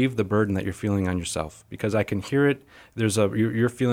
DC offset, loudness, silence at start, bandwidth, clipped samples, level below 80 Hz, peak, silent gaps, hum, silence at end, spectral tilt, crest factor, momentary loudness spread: under 0.1%; -25 LUFS; 0 s; 16 kHz; under 0.1%; -52 dBFS; -8 dBFS; none; none; 0 s; -6 dB/octave; 16 dB; 9 LU